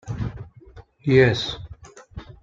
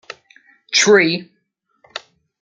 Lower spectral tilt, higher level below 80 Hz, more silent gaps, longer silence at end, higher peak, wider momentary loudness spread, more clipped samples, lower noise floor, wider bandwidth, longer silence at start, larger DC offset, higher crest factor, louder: first, -6.5 dB/octave vs -2.5 dB/octave; first, -44 dBFS vs -68 dBFS; neither; second, 0.1 s vs 0.45 s; about the same, -2 dBFS vs -2 dBFS; about the same, 25 LU vs 25 LU; neither; second, -47 dBFS vs -60 dBFS; second, 7.6 kHz vs 9.4 kHz; second, 0.05 s vs 0.7 s; neither; about the same, 22 dB vs 18 dB; second, -21 LUFS vs -14 LUFS